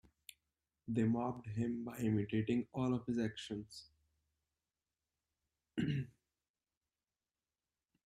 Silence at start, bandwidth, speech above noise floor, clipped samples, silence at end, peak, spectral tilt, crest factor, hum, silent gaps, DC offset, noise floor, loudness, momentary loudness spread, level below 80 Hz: 0.85 s; 14 kHz; over 52 dB; under 0.1%; 1.95 s; -24 dBFS; -7.5 dB/octave; 18 dB; none; none; under 0.1%; under -90 dBFS; -39 LUFS; 19 LU; -70 dBFS